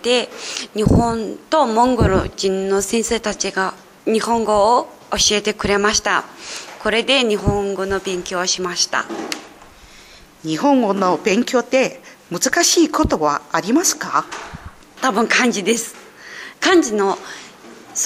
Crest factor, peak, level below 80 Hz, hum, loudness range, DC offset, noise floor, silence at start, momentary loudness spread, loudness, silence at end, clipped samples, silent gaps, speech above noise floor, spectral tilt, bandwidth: 16 dB; -2 dBFS; -38 dBFS; none; 3 LU; under 0.1%; -44 dBFS; 0 s; 14 LU; -17 LUFS; 0 s; under 0.1%; none; 26 dB; -3.5 dB/octave; 16 kHz